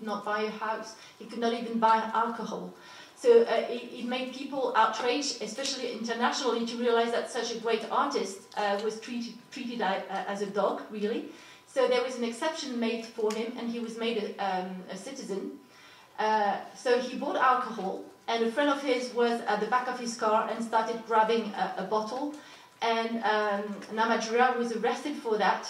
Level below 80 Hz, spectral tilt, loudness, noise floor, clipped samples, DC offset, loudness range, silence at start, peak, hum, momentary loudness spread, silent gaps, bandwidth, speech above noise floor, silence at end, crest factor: -86 dBFS; -3.5 dB/octave; -29 LUFS; -54 dBFS; under 0.1%; under 0.1%; 5 LU; 0 s; -10 dBFS; none; 12 LU; none; 13.5 kHz; 25 dB; 0 s; 20 dB